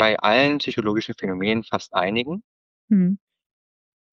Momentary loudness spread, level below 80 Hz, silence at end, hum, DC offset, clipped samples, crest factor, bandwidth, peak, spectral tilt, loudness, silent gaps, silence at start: 11 LU; -62 dBFS; 0.95 s; none; under 0.1%; under 0.1%; 18 dB; 7.2 kHz; -4 dBFS; -6.5 dB/octave; -22 LUFS; 2.44-2.88 s; 0 s